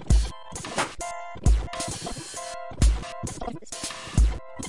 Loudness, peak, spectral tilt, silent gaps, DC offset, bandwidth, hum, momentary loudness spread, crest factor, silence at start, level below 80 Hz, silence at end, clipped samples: -29 LUFS; -8 dBFS; -4.5 dB/octave; none; 0.3%; 11.5 kHz; none; 10 LU; 18 dB; 0 s; -28 dBFS; 0 s; under 0.1%